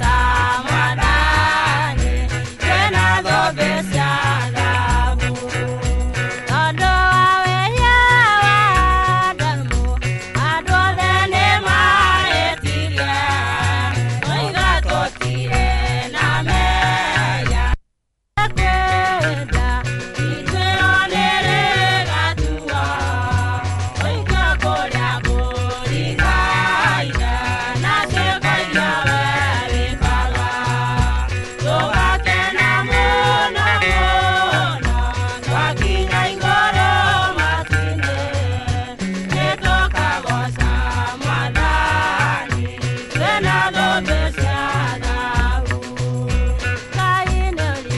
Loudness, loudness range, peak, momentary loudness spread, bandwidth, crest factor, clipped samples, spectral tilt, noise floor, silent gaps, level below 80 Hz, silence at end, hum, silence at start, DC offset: -17 LUFS; 5 LU; -2 dBFS; 7 LU; 11.5 kHz; 14 dB; under 0.1%; -4.5 dB/octave; -71 dBFS; none; -24 dBFS; 0 s; none; 0 s; under 0.1%